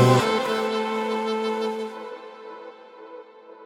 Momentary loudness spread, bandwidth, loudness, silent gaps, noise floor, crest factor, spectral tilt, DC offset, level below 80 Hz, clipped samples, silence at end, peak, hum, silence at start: 21 LU; 17 kHz; -24 LUFS; none; -44 dBFS; 20 dB; -6 dB/octave; under 0.1%; -68 dBFS; under 0.1%; 0 s; -4 dBFS; none; 0 s